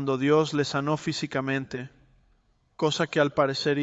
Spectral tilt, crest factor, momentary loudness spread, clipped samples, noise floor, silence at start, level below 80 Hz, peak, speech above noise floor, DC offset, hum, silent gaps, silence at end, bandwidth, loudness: -5.5 dB/octave; 18 dB; 9 LU; under 0.1%; -66 dBFS; 0 s; -64 dBFS; -8 dBFS; 40 dB; under 0.1%; none; none; 0 s; 8.2 kHz; -26 LUFS